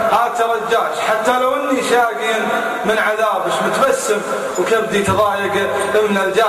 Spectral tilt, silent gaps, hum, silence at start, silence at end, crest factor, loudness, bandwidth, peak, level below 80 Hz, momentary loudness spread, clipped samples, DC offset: -3.5 dB/octave; none; none; 0 s; 0 s; 14 dB; -16 LUFS; 15 kHz; -2 dBFS; -48 dBFS; 3 LU; under 0.1%; under 0.1%